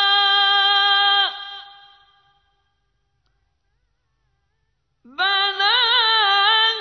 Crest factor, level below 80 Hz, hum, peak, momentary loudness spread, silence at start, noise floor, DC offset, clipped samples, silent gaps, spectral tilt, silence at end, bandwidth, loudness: 16 dB; -68 dBFS; none; -6 dBFS; 16 LU; 0 s; -71 dBFS; under 0.1%; under 0.1%; none; 1 dB/octave; 0 s; 6.4 kHz; -15 LUFS